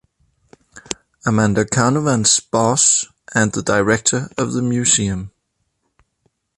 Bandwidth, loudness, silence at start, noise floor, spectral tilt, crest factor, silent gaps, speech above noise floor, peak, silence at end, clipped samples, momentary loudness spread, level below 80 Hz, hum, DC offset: 11.5 kHz; -16 LUFS; 0.75 s; -70 dBFS; -3.5 dB/octave; 18 dB; none; 54 dB; 0 dBFS; 1.3 s; under 0.1%; 12 LU; -48 dBFS; none; under 0.1%